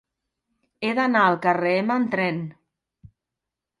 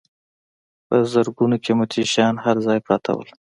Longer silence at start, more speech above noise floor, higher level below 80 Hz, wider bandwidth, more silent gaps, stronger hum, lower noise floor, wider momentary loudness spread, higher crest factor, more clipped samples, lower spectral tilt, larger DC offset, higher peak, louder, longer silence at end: about the same, 0.8 s vs 0.9 s; second, 64 dB vs over 71 dB; second, -68 dBFS vs -62 dBFS; about the same, 11 kHz vs 11.5 kHz; neither; neither; second, -86 dBFS vs under -90 dBFS; first, 11 LU vs 3 LU; about the same, 20 dB vs 18 dB; neither; first, -7 dB/octave vs -5.5 dB/octave; neither; second, -6 dBFS vs -2 dBFS; about the same, -22 LUFS vs -20 LUFS; first, 1.3 s vs 0.35 s